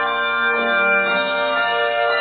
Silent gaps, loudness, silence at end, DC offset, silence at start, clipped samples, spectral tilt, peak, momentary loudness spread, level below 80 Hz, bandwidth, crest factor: none; -17 LUFS; 0 s; under 0.1%; 0 s; under 0.1%; -6.5 dB/octave; -6 dBFS; 3 LU; -72 dBFS; 4.7 kHz; 12 dB